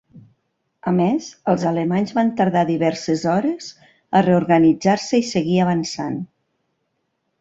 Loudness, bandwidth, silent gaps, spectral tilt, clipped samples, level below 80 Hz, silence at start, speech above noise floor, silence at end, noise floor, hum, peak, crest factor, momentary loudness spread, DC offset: -19 LUFS; 8 kHz; none; -6.5 dB/octave; under 0.1%; -58 dBFS; 0.15 s; 54 dB; 1.15 s; -72 dBFS; none; -2 dBFS; 18 dB; 11 LU; under 0.1%